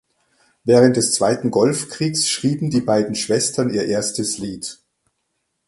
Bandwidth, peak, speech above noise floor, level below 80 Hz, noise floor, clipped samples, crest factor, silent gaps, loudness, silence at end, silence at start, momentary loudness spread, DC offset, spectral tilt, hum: 11.5 kHz; 0 dBFS; 55 dB; -56 dBFS; -73 dBFS; under 0.1%; 18 dB; none; -18 LUFS; 0.95 s; 0.65 s; 11 LU; under 0.1%; -4.5 dB/octave; none